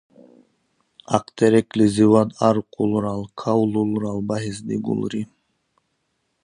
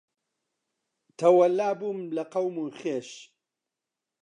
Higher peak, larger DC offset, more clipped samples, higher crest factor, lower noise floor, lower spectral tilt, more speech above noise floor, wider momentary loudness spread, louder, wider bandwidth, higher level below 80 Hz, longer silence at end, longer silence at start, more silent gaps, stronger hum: first, 0 dBFS vs -8 dBFS; neither; neither; about the same, 22 dB vs 20 dB; second, -72 dBFS vs -88 dBFS; about the same, -7 dB/octave vs -6 dB/octave; second, 52 dB vs 62 dB; second, 11 LU vs 14 LU; first, -21 LUFS vs -26 LUFS; about the same, 10.5 kHz vs 10 kHz; first, -56 dBFS vs -86 dBFS; first, 1.2 s vs 1 s; about the same, 1.1 s vs 1.2 s; neither; neither